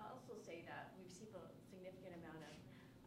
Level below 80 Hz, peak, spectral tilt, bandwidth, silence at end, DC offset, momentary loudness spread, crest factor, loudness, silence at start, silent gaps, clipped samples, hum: -80 dBFS; -40 dBFS; -5 dB/octave; 16 kHz; 0 s; under 0.1%; 5 LU; 18 dB; -57 LUFS; 0 s; none; under 0.1%; none